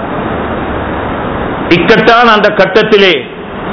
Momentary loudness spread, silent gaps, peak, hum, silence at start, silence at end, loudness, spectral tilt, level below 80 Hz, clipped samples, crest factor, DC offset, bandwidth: 11 LU; none; 0 dBFS; none; 0 s; 0 s; -8 LUFS; -6 dB/octave; -30 dBFS; 5%; 10 dB; under 0.1%; 5.4 kHz